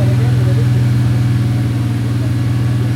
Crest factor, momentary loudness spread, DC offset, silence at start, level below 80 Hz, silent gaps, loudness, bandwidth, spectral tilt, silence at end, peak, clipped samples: 10 dB; 3 LU; under 0.1%; 0 s; -32 dBFS; none; -15 LUFS; 12.5 kHz; -7.5 dB/octave; 0 s; -4 dBFS; under 0.1%